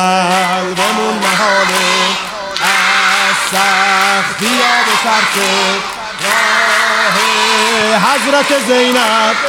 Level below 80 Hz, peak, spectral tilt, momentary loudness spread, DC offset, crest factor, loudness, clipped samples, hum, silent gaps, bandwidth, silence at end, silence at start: -52 dBFS; 0 dBFS; -2 dB/octave; 4 LU; under 0.1%; 12 dB; -11 LUFS; under 0.1%; none; none; 17 kHz; 0 s; 0 s